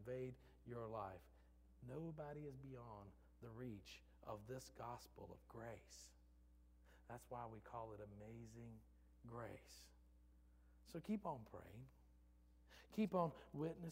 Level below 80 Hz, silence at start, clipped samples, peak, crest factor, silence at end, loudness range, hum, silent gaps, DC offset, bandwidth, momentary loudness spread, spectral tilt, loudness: -70 dBFS; 0 s; under 0.1%; -30 dBFS; 24 dB; 0 s; 9 LU; none; none; under 0.1%; 16 kHz; 16 LU; -7 dB/octave; -53 LUFS